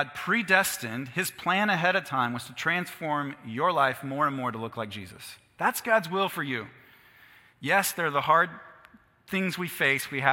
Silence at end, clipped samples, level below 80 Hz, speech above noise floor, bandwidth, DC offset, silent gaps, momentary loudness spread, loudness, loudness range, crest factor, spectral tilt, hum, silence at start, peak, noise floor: 0 s; under 0.1%; -70 dBFS; 29 dB; 17 kHz; under 0.1%; none; 12 LU; -27 LUFS; 3 LU; 24 dB; -3.5 dB/octave; none; 0 s; -4 dBFS; -57 dBFS